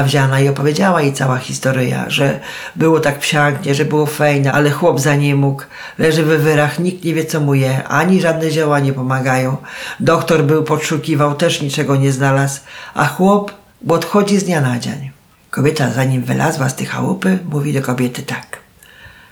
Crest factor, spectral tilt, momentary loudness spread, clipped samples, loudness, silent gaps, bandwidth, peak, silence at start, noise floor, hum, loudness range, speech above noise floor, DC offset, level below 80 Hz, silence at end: 14 dB; -5.5 dB/octave; 10 LU; under 0.1%; -15 LUFS; none; 18 kHz; -2 dBFS; 0 s; -42 dBFS; none; 3 LU; 27 dB; under 0.1%; -52 dBFS; 0.25 s